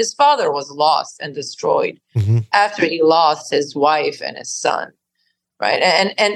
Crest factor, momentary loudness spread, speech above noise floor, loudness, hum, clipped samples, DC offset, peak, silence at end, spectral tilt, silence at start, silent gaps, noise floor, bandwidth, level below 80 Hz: 16 dB; 11 LU; 52 dB; -17 LUFS; none; under 0.1%; under 0.1%; -2 dBFS; 0 s; -4 dB/octave; 0 s; none; -69 dBFS; 12 kHz; -64 dBFS